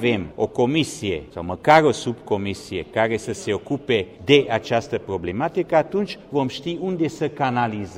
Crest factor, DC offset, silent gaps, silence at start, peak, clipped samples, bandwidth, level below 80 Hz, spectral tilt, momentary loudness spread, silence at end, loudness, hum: 20 dB; under 0.1%; none; 0 s; -2 dBFS; under 0.1%; 14 kHz; -52 dBFS; -5.5 dB/octave; 10 LU; 0 s; -22 LUFS; none